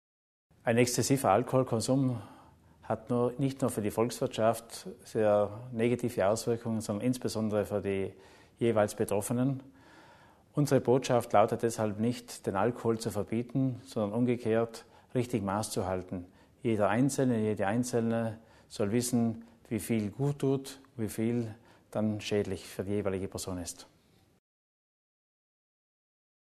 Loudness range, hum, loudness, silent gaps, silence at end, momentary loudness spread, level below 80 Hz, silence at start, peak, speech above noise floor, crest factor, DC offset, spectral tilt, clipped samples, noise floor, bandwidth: 5 LU; none; -31 LUFS; none; 2.75 s; 11 LU; -64 dBFS; 0.65 s; -10 dBFS; 29 dB; 22 dB; under 0.1%; -6 dB/octave; under 0.1%; -59 dBFS; 13.5 kHz